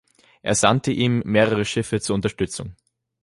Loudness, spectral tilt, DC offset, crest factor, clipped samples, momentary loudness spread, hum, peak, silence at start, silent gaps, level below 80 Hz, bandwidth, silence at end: -21 LUFS; -4.5 dB/octave; under 0.1%; 20 dB; under 0.1%; 11 LU; none; -2 dBFS; 0.45 s; none; -48 dBFS; 11.5 kHz; 0.5 s